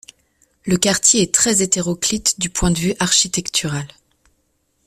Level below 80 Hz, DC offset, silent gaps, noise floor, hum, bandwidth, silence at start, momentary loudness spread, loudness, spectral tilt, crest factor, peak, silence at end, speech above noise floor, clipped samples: -40 dBFS; under 0.1%; none; -66 dBFS; none; 15.5 kHz; 0.65 s; 10 LU; -16 LUFS; -2.5 dB/octave; 18 dB; 0 dBFS; 1 s; 48 dB; under 0.1%